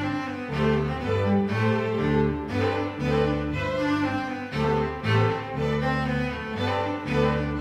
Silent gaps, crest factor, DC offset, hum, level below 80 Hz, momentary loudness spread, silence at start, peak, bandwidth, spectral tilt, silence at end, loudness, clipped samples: none; 14 dB; under 0.1%; none; -40 dBFS; 5 LU; 0 s; -10 dBFS; 10.5 kHz; -7.5 dB/octave; 0 s; -25 LUFS; under 0.1%